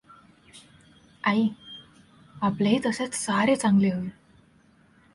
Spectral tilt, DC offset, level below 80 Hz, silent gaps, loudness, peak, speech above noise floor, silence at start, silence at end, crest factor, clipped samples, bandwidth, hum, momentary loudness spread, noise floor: -5 dB/octave; under 0.1%; -62 dBFS; none; -25 LUFS; -10 dBFS; 36 dB; 0.55 s; 1.05 s; 18 dB; under 0.1%; 11.5 kHz; none; 17 LU; -59 dBFS